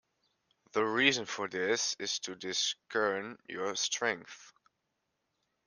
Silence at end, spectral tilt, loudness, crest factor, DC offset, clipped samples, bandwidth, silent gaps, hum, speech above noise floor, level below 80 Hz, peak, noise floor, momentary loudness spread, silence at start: 1.15 s; -1.5 dB/octave; -32 LUFS; 26 dB; under 0.1%; under 0.1%; 10.5 kHz; none; none; 49 dB; -80 dBFS; -10 dBFS; -83 dBFS; 12 LU; 0.75 s